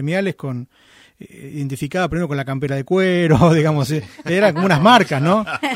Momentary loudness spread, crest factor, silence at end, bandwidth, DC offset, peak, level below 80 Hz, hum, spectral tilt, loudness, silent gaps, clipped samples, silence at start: 15 LU; 18 dB; 0 s; 15.5 kHz; under 0.1%; 0 dBFS; -46 dBFS; none; -6.5 dB/octave; -17 LUFS; none; under 0.1%; 0 s